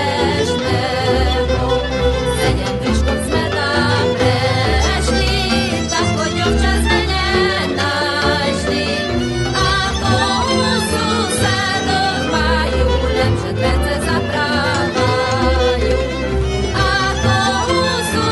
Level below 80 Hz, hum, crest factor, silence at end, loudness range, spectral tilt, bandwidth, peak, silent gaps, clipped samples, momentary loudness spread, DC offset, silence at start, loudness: -24 dBFS; none; 14 dB; 0 s; 1 LU; -4.5 dB/octave; 12 kHz; -2 dBFS; none; under 0.1%; 3 LU; under 0.1%; 0 s; -16 LUFS